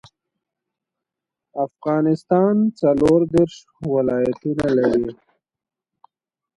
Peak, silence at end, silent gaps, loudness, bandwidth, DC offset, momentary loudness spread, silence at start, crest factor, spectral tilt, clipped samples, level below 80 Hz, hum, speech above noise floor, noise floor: -4 dBFS; 1.45 s; none; -19 LUFS; 11.5 kHz; under 0.1%; 11 LU; 1.55 s; 18 dB; -8 dB/octave; under 0.1%; -52 dBFS; none; 68 dB; -87 dBFS